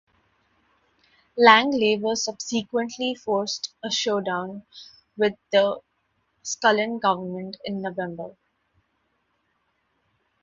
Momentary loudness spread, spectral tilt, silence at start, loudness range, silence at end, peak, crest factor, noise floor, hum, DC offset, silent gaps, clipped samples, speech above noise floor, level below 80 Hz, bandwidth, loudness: 20 LU; -3 dB/octave; 1.35 s; 7 LU; 2.15 s; 0 dBFS; 26 dB; -72 dBFS; none; under 0.1%; none; under 0.1%; 48 dB; -70 dBFS; 7.8 kHz; -23 LUFS